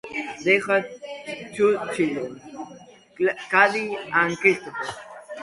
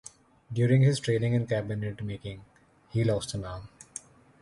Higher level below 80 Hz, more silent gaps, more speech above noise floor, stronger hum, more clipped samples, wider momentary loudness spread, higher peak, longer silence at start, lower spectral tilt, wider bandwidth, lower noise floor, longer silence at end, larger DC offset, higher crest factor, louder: second, -66 dBFS vs -54 dBFS; neither; first, 25 dB vs 20 dB; neither; neither; about the same, 20 LU vs 20 LU; first, -2 dBFS vs -12 dBFS; second, 0.05 s vs 0.5 s; second, -4.5 dB/octave vs -6.5 dB/octave; about the same, 11.5 kHz vs 11.5 kHz; about the same, -47 dBFS vs -48 dBFS; second, 0 s vs 0.75 s; neither; first, 22 dB vs 16 dB; first, -22 LUFS vs -28 LUFS